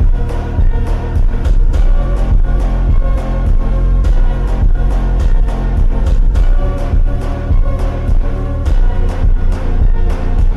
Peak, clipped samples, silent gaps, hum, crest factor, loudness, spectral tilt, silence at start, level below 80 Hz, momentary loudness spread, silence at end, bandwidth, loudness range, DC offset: -4 dBFS; under 0.1%; none; none; 6 dB; -16 LUFS; -8 dB/octave; 0 s; -10 dBFS; 3 LU; 0 s; 3.9 kHz; 1 LU; under 0.1%